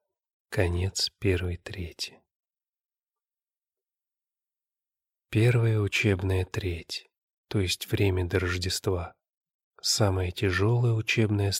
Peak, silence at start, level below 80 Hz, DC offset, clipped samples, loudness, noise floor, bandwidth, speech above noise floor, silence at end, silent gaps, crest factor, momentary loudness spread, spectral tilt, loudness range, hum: -8 dBFS; 0.5 s; -50 dBFS; under 0.1%; under 0.1%; -27 LUFS; under -90 dBFS; 16 kHz; over 64 dB; 0 s; 2.36-2.40 s, 2.69-2.73 s, 3.03-3.07 s, 7.23-7.28 s, 7.34-7.44 s, 9.34-9.41 s, 9.54-9.71 s; 20 dB; 11 LU; -5 dB/octave; 10 LU; none